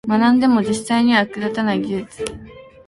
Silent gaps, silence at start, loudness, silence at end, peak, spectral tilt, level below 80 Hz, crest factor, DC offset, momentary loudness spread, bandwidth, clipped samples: none; 0.05 s; -17 LUFS; 0.25 s; -2 dBFS; -5 dB/octave; -50 dBFS; 16 dB; under 0.1%; 15 LU; 11.5 kHz; under 0.1%